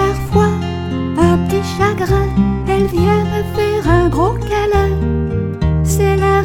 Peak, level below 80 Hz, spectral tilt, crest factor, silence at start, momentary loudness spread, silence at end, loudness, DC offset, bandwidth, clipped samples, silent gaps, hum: 0 dBFS; -24 dBFS; -7 dB/octave; 14 dB; 0 s; 5 LU; 0 s; -15 LUFS; under 0.1%; 17.5 kHz; under 0.1%; none; none